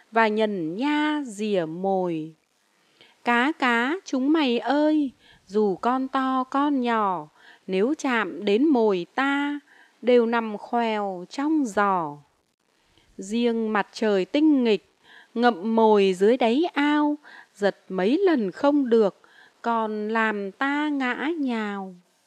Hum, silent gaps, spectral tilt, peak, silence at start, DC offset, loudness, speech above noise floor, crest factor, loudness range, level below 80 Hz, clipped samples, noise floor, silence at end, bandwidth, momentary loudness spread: none; 12.54-12.58 s; -5.5 dB/octave; -4 dBFS; 0.15 s; under 0.1%; -23 LUFS; 43 dB; 20 dB; 4 LU; -74 dBFS; under 0.1%; -66 dBFS; 0.3 s; 10 kHz; 9 LU